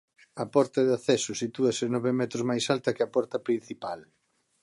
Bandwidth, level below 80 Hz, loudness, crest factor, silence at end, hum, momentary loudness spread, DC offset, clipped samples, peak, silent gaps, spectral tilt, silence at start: 11.5 kHz; -72 dBFS; -28 LUFS; 18 dB; 0.6 s; none; 12 LU; under 0.1%; under 0.1%; -10 dBFS; none; -5 dB/octave; 0.35 s